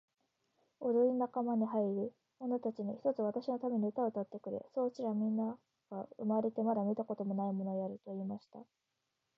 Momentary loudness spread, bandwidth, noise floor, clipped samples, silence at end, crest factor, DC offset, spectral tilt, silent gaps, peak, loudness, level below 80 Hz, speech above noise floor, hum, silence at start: 10 LU; 6 kHz; -86 dBFS; under 0.1%; 0.75 s; 16 dB; under 0.1%; -9.5 dB/octave; none; -22 dBFS; -37 LUFS; -88 dBFS; 49 dB; none; 0.8 s